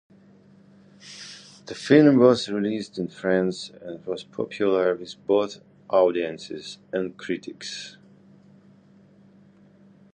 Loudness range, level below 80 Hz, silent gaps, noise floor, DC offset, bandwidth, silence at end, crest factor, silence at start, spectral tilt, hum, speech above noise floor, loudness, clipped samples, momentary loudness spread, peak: 13 LU; -68 dBFS; none; -54 dBFS; under 0.1%; 9.8 kHz; 2.25 s; 22 dB; 1.05 s; -6 dB/octave; none; 31 dB; -23 LUFS; under 0.1%; 22 LU; -2 dBFS